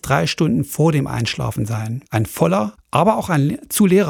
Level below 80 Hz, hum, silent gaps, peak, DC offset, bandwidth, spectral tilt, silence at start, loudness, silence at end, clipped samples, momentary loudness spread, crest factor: -46 dBFS; none; none; 0 dBFS; under 0.1%; 19 kHz; -6 dB/octave; 0.05 s; -19 LUFS; 0 s; under 0.1%; 6 LU; 18 dB